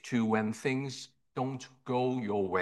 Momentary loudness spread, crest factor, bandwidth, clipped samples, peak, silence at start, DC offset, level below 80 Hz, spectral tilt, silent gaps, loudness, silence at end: 12 LU; 18 dB; 12 kHz; under 0.1%; -16 dBFS; 0.05 s; under 0.1%; -76 dBFS; -6 dB/octave; none; -33 LUFS; 0 s